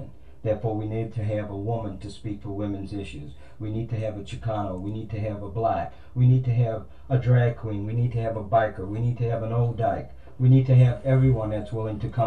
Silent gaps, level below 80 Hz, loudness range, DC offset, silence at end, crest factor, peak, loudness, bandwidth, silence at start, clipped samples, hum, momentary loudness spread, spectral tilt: none; -46 dBFS; 9 LU; 0.8%; 0 s; 16 dB; -8 dBFS; -25 LUFS; 4.6 kHz; 0 s; under 0.1%; none; 14 LU; -9.5 dB/octave